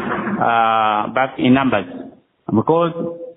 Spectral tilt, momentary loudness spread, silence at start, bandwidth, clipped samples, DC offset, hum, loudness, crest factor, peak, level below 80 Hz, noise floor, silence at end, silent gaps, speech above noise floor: -4.5 dB/octave; 13 LU; 0 s; 4 kHz; under 0.1%; under 0.1%; none; -17 LUFS; 14 dB; -4 dBFS; -54 dBFS; -38 dBFS; 0.05 s; none; 22 dB